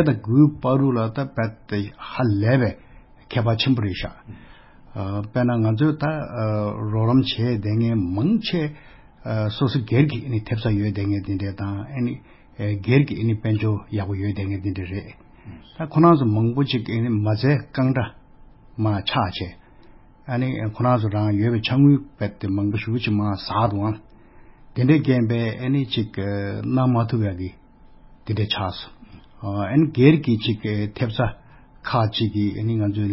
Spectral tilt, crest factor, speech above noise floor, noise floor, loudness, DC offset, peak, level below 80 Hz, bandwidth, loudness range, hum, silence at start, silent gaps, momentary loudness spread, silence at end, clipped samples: -11.5 dB/octave; 20 dB; 27 dB; -47 dBFS; -22 LUFS; under 0.1%; -2 dBFS; -44 dBFS; 5.8 kHz; 3 LU; none; 0 s; none; 12 LU; 0 s; under 0.1%